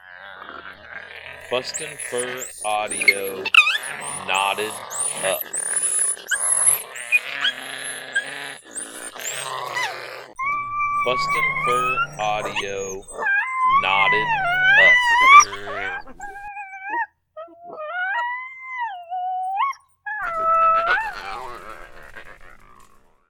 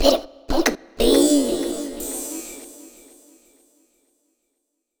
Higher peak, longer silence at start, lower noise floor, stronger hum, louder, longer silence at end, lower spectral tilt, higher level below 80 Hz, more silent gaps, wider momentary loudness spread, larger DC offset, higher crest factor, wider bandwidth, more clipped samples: about the same, 0 dBFS vs -2 dBFS; about the same, 0.05 s vs 0 s; second, -51 dBFS vs -76 dBFS; neither; about the same, -19 LUFS vs -21 LUFS; second, 0.45 s vs 2.1 s; second, 0 dB/octave vs -3 dB/octave; second, -52 dBFS vs -36 dBFS; neither; about the same, 21 LU vs 20 LU; neither; about the same, 22 dB vs 22 dB; about the same, 19 kHz vs over 20 kHz; neither